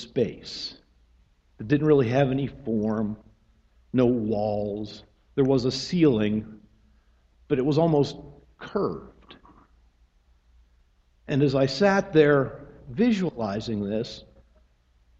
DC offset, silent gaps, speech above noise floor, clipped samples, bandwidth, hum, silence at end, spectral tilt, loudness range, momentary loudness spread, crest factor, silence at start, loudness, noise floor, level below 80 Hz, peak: under 0.1%; none; 38 dB; under 0.1%; 8 kHz; none; 1 s; -7 dB/octave; 5 LU; 17 LU; 20 dB; 0 s; -25 LUFS; -62 dBFS; -54 dBFS; -6 dBFS